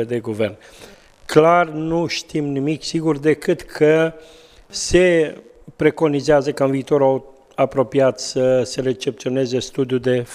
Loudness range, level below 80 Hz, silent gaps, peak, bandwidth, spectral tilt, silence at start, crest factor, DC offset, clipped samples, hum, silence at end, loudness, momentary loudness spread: 2 LU; -44 dBFS; none; 0 dBFS; 14.5 kHz; -5.5 dB/octave; 0 s; 18 dB; under 0.1%; under 0.1%; none; 0 s; -18 LUFS; 9 LU